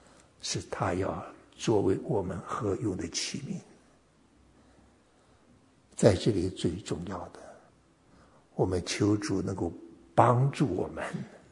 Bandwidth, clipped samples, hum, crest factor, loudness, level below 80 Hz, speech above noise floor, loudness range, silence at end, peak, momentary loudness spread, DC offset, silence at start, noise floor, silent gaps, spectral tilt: 11 kHz; under 0.1%; none; 26 dB; -30 LUFS; -62 dBFS; 34 dB; 7 LU; 0.15 s; -4 dBFS; 16 LU; under 0.1%; 0.4 s; -63 dBFS; none; -5.5 dB/octave